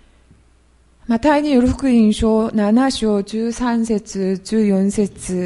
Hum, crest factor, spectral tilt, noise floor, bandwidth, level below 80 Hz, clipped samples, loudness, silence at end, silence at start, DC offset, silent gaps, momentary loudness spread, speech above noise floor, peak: none; 14 dB; -6 dB/octave; -53 dBFS; 11.5 kHz; -38 dBFS; under 0.1%; -17 LUFS; 0 s; 1.1 s; under 0.1%; none; 7 LU; 37 dB; -2 dBFS